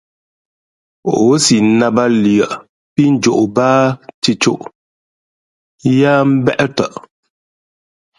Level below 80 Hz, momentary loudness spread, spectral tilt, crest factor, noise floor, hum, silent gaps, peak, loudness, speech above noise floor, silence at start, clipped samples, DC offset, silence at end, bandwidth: -54 dBFS; 11 LU; -5 dB/octave; 14 dB; under -90 dBFS; none; 2.69-2.96 s, 4.14-4.22 s, 4.75-5.78 s; 0 dBFS; -13 LUFS; over 78 dB; 1.05 s; under 0.1%; under 0.1%; 1.2 s; 11.5 kHz